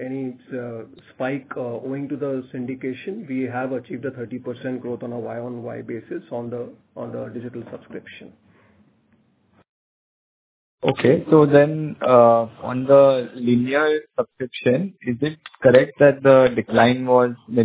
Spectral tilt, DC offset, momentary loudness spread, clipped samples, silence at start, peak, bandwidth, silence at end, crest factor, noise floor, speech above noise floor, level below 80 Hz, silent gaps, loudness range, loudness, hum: -11 dB/octave; under 0.1%; 18 LU; under 0.1%; 0 s; 0 dBFS; 4 kHz; 0 s; 20 dB; -61 dBFS; 41 dB; -60 dBFS; 9.69-10.78 s; 17 LU; -19 LUFS; none